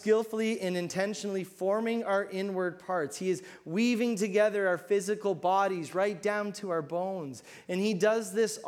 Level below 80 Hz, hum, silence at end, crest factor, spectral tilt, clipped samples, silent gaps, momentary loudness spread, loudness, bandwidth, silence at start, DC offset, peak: -80 dBFS; none; 0 s; 16 dB; -5 dB/octave; under 0.1%; none; 8 LU; -30 LUFS; 16.5 kHz; 0 s; under 0.1%; -14 dBFS